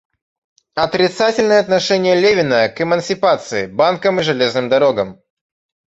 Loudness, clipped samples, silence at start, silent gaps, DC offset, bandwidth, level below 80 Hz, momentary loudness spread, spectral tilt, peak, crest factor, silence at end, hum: -15 LUFS; under 0.1%; 0.75 s; none; under 0.1%; 8.2 kHz; -54 dBFS; 7 LU; -4.5 dB/octave; -2 dBFS; 14 dB; 0.8 s; none